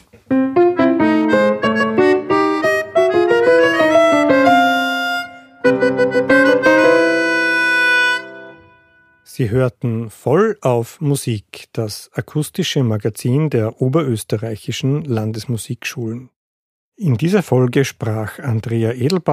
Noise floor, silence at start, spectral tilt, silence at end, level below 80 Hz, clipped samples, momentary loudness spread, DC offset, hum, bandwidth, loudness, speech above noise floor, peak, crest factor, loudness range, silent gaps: -52 dBFS; 0.3 s; -6 dB/octave; 0 s; -54 dBFS; under 0.1%; 12 LU; under 0.1%; none; 15.5 kHz; -16 LUFS; 35 dB; -2 dBFS; 14 dB; 6 LU; 16.36-16.92 s